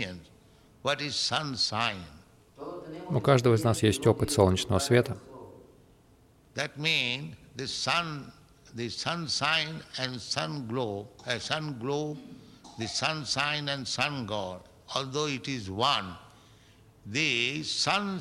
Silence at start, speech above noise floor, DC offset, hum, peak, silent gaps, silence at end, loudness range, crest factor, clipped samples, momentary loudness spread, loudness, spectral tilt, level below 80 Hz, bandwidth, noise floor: 0 s; 31 dB; under 0.1%; none; -6 dBFS; none; 0 s; 6 LU; 24 dB; under 0.1%; 17 LU; -29 LUFS; -4 dB/octave; -58 dBFS; 16 kHz; -60 dBFS